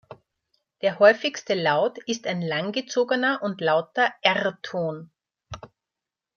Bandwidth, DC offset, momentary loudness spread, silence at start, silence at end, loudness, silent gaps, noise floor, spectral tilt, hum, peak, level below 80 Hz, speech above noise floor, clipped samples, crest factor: 7 kHz; under 0.1%; 15 LU; 0.1 s; 0.7 s; -23 LUFS; none; -88 dBFS; -4 dB/octave; none; -4 dBFS; -64 dBFS; 65 dB; under 0.1%; 22 dB